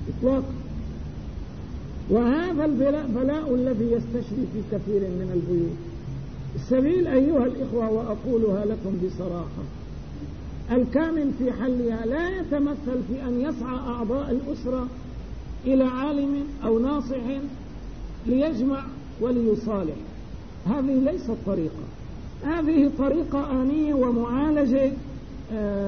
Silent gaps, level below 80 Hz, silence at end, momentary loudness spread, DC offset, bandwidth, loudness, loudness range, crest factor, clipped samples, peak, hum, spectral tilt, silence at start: none; -40 dBFS; 0 s; 15 LU; 0.6%; 6.6 kHz; -25 LUFS; 3 LU; 16 dB; under 0.1%; -10 dBFS; none; -9 dB/octave; 0 s